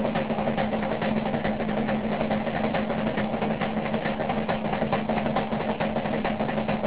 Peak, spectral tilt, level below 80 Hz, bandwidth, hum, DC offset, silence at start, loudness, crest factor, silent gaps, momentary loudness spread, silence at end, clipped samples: -12 dBFS; -5 dB/octave; -48 dBFS; 4 kHz; none; 0.7%; 0 s; -27 LUFS; 14 dB; none; 1 LU; 0 s; under 0.1%